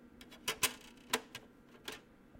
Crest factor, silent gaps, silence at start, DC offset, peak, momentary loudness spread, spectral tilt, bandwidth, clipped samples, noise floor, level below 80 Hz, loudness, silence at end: 28 dB; none; 0 s; under 0.1%; -16 dBFS; 18 LU; -0.5 dB/octave; 16.5 kHz; under 0.1%; -59 dBFS; -70 dBFS; -39 LUFS; 0 s